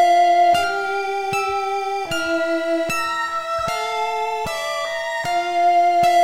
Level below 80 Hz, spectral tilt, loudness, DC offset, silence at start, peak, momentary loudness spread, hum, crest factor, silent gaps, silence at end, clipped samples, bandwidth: -52 dBFS; -3 dB/octave; -20 LUFS; under 0.1%; 0 s; -6 dBFS; 8 LU; none; 12 dB; none; 0 s; under 0.1%; 16 kHz